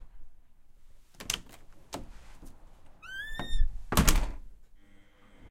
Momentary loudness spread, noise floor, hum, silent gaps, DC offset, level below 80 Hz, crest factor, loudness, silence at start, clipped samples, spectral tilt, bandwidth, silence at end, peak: 28 LU; -55 dBFS; none; none; under 0.1%; -34 dBFS; 26 dB; -33 LUFS; 0 s; under 0.1%; -3.5 dB/octave; 16.5 kHz; 0.05 s; -6 dBFS